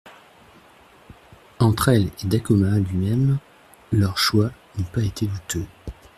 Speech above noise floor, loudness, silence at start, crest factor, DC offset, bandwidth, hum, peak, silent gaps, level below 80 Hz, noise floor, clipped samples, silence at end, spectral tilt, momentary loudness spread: 31 dB; -22 LUFS; 0.05 s; 18 dB; under 0.1%; 15 kHz; none; -4 dBFS; none; -46 dBFS; -51 dBFS; under 0.1%; 0.25 s; -6 dB/octave; 10 LU